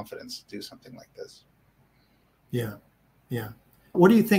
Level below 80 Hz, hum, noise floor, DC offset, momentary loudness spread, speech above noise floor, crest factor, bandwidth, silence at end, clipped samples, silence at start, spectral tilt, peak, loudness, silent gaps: -64 dBFS; none; -64 dBFS; under 0.1%; 27 LU; 39 dB; 22 dB; 16 kHz; 0 s; under 0.1%; 0 s; -6.5 dB/octave; -6 dBFS; -27 LUFS; none